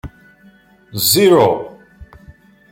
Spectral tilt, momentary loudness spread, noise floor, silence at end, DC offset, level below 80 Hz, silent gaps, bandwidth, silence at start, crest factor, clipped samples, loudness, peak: -4 dB/octave; 20 LU; -48 dBFS; 0.7 s; under 0.1%; -46 dBFS; none; 16.5 kHz; 0.05 s; 18 dB; under 0.1%; -13 LUFS; 0 dBFS